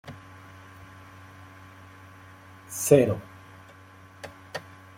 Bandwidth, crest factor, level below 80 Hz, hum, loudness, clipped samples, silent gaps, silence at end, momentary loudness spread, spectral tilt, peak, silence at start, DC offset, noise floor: 16.5 kHz; 26 dB; -66 dBFS; none; -25 LUFS; under 0.1%; none; 0.35 s; 28 LU; -5.5 dB/octave; -4 dBFS; 0.05 s; under 0.1%; -50 dBFS